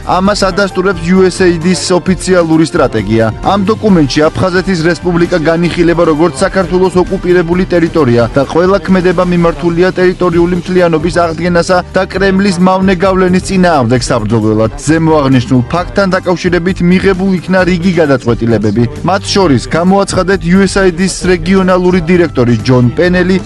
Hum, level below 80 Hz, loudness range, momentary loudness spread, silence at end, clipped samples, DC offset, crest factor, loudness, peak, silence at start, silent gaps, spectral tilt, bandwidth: none; -28 dBFS; 1 LU; 3 LU; 0 s; 0.2%; under 0.1%; 8 dB; -9 LUFS; 0 dBFS; 0 s; none; -6 dB/octave; 11.5 kHz